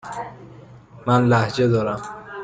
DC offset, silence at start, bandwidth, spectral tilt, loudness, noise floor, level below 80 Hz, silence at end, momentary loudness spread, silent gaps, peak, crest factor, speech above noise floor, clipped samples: under 0.1%; 0.05 s; 9.2 kHz; -7 dB/octave; -20 LUFS; -43 dBFS; -54 dBFS; 0 s; 17 LU; none; -6 dBFS; 16 dB; 25 dB; under 0.1%